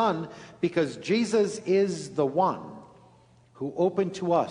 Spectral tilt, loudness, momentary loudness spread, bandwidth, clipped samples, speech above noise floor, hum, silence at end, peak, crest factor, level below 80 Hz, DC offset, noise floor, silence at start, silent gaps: -6 dB/octave; -27 LUFS; 12 LU; 10.5 kHz; under 0.1%; 31 dB; none; 0 s; -10 dBFS; 16 dB; -68 dBFS; under 0.1%; -57 dBFS; 0 s; none